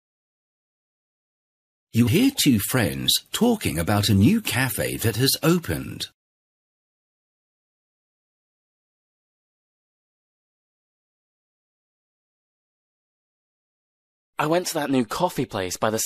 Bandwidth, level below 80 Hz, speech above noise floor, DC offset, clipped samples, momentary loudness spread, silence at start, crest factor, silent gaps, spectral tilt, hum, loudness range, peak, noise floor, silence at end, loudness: 15.5 kHz; -52 dBFS; over 68 dB; under 0.1%; under 0.1%; 10 LU; 1.95 s; 20 dB; 6.14-14.33 s; -4.5 dB/octave; none; 11 LU; -6 dBFS; under -90 dBFS; 0 s; -22 LUFS